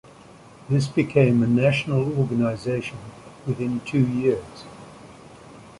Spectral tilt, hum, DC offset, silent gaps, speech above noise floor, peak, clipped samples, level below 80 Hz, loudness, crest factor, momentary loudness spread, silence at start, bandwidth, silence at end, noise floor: -7.5 dB/octave; none; under 0.1%; none; 25 dB; -4 dBFS; under 0.1%; -54 dBFS; -22 LUFS; 18 dB; 22 LU; 0.65 s; 11.5 kHz; 0.1 s; -47 dBFS